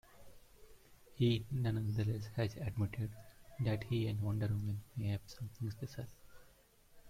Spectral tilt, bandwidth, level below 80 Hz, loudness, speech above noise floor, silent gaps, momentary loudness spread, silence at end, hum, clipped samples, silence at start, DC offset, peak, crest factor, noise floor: -7.5 dB/octave; 15.5 kHz; -60 dBFS; -39 LUFS; 28 dB; none; 12 LU; 0 s; none; under 0.1%; 0.1 s; under 0.1%; -22 dBFS; 18 dB; -66 dBFS